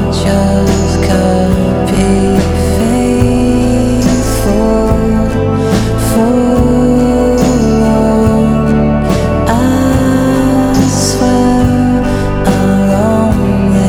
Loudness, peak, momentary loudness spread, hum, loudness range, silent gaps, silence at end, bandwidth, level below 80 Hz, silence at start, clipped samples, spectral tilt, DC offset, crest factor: -10 LUFS; 0 dBFS; 3 LU; none; 1 LU; none; 0 s; 17.5 kHz; -20 dBFS; 0 s; under 0.1%; -6.5 dB/octave; under 0.1%; 10 dB